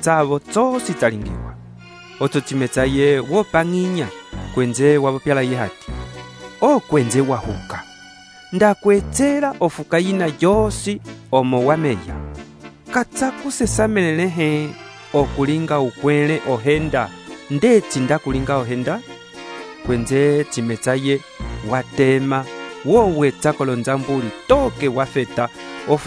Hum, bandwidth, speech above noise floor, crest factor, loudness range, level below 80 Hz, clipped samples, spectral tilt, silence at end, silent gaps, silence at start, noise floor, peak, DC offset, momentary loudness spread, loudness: none; 11 kHz; 24 dB; 18 dB; 3 LU; -38 dBFS; under 0.1%; -5.5 dB/octave; 0 s; none; 0 s; -42 dBFS; -2 dBFS; under 0.1%; 16 LU; -18 LUFS